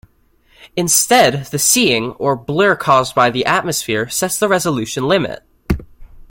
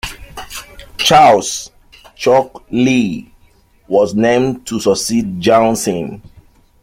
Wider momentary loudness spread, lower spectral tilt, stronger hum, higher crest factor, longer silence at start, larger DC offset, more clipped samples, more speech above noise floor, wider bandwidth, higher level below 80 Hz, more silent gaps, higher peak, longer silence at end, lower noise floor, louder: second, 12 LU vs 19 LU; about the same, -3 dB/octave vs -4 dB/octave; neither; about the same, 16 dB vs 14 dB; first, 0.6 s vs 0.05 s; neither; neither; about the same, 39 dB vs 37 dB; about the same, 17 kHz vs 16.5 kHz; about the same, -38 dBFS vs -42 dBFS; neither; about the same, 0 dBFS vs 0 dBFS; second, 0.1 s vs 0.65 s; first, -54 dBFS vs -50 dBFS; about the same, -15 LUFS vs -13 LUFS